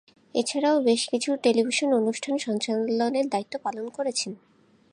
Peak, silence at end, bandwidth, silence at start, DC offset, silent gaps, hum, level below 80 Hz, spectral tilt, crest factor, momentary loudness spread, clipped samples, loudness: -8 dBFS; 0.55 s; 11 kHz; 0.35 s; under 0.1%; none; none; -78 dBFS; -3.5 dB/octave; 16 dB; 9 LU; under 0.1%; -25 LUFS